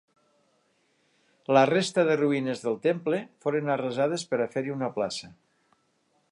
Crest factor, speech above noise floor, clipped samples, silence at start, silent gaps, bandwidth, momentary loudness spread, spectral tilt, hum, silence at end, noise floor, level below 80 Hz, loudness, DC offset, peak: 20 dB; 44 dB; under 0.1%; 1.5 s; none; 11.5 kHz; 9 LU; -5.5 dB/octave; none; 1 s; -70 dBFS; -76 dBFS; -27 LUFS; under 0.1%; -8 dBFS